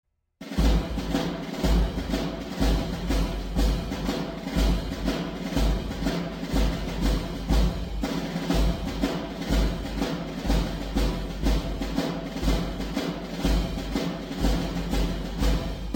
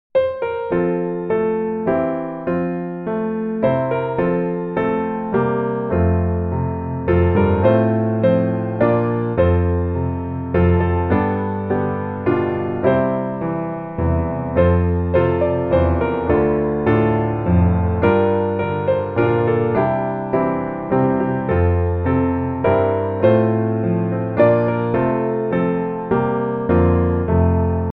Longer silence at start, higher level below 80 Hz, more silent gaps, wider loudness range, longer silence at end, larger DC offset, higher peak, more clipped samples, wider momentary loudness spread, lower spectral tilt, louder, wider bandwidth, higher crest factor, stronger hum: first, 0.4 s vs 0.15 s; first, -28 dBFS vs -34 dBFS; neither; about the same, 1 LU vs 3 LU; about the same, 0 s vs 0 s; neither; second, -10 dBFS vs -2 dBFS; neither; about the same, 4 LU vs 6 LU; second, -6 dB/octave vs -11.5 dB/octave; second, -28 LUFS vs -18 LUFS; first, 17 kHz vs 4.1 kHz; about the same, 16 dB vs 16 dB; neither